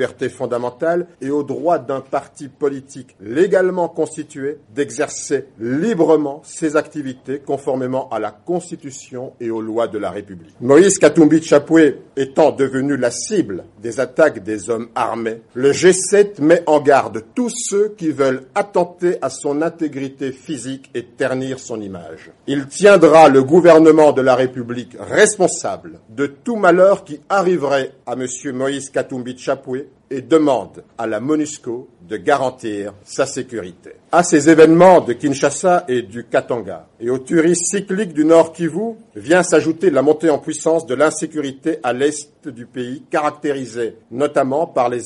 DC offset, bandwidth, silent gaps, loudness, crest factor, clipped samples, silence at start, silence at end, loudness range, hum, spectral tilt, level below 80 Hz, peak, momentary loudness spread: under 0.1%; 11.5 kHz; none; -16 LUFS; 16 dB; under 0.1%; 0 s; 0 s; 9 LU; none; -5 dB/octave; -60 dBFS; 0 dBFS; 16 LU